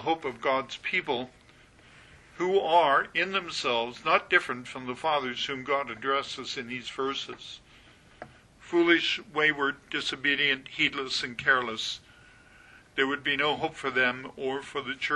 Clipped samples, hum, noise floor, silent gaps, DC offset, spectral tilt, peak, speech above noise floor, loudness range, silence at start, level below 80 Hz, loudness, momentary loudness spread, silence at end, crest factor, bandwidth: under 0.1%; none; -56 dBFS; none; under 0.1%; -3.5 dB/octave; -8 dBFS; 28 dB; 5 LU; 0 s; -64 dBFS; -28 LUFS; 12 LU; 0 s; 22 dB; 11.5 kHz